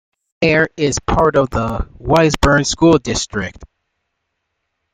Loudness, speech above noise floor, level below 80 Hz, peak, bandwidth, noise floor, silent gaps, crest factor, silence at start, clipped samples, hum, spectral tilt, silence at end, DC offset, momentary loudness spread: -15 LUFS; 58 dB; -32 dBFS; -2 dBFS; 15.5 kHz; -73 dBFS; none; 16 dB; 0.4 s; under 0.1%; none; -5 dB/octave; 1.3 s; under 0.1%; 10 LU